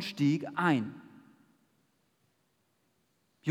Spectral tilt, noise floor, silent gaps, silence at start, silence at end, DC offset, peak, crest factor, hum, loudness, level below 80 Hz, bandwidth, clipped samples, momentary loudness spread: -6.5 dB/octave; -75 dBFS; none; 0 s; 0 s; under 0.1%; -14 dBFS; 20 dB; none; -31 LUFS; under -90 dBFS; 13.5 kHz; under 0.1%; 13 LU